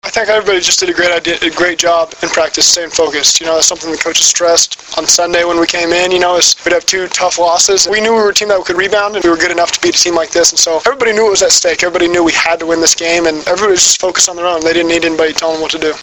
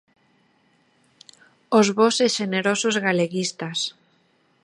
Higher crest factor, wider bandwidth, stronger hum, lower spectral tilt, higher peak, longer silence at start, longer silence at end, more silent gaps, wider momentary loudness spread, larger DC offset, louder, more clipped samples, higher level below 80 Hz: second, 12 dB vs 20 dB; first, over 20 kHz vs 11.5 kHz; neither; second, -0.5 dB/octave vs -3.5 dB/octave; first, 0 dBFS vs -4 dBFS; second, 0.05 s vs 1.7 s; second, 0 s vs 0.75 s; neither; second, 5 LU vs 8 LU; neither; first, -10 LUFS vs -21 LUFS; first, 0.3% vs under 0.1%; first, -44 dBFS vs -74 dBFS